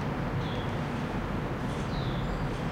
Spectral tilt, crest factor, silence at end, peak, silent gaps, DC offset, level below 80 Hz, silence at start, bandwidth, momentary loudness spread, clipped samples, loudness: -7 dB/octave; 12 dB; 0 s; -20 dBFS; none; under 0.1%; -40 dBFS; 0 s; 16 kHz; 1 LU; under 0.1%; -33 LUFS